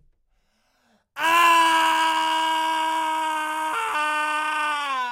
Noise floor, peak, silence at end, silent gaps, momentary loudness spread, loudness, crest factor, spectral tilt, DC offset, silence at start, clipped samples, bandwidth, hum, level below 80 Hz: -67 dBFS; -6 dBFS; 0 s; none; 9 LU; -21 LUFS; 16 dB; 0.5 dB/octave; under 0.1%; 1.15 s; under 0.1%; 16 kHz; none; -72 dBFS